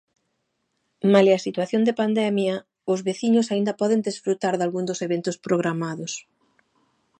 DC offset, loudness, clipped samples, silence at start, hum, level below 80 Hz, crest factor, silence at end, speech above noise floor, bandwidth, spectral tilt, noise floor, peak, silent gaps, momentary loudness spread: under 0.1%; -23 LUFS; under 0.1%; 1.05 s; none; -74 dBFS; 22 dB; 1 s; 52 dB; 9.6 kHz; -5.5 dB/octave; -74 dBFS; -2 dBFS; none; 9 LU